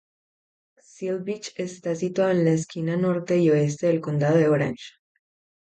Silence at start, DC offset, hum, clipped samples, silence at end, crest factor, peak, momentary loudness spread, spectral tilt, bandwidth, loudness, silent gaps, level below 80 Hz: 1 s; under 0.1%; none; under 0.1%; 0.75 s; 16 dB; -8 dBFS; 12 LU; -7 dB/octave; 9 kHz; -24 LUFS; none; -66 dBFS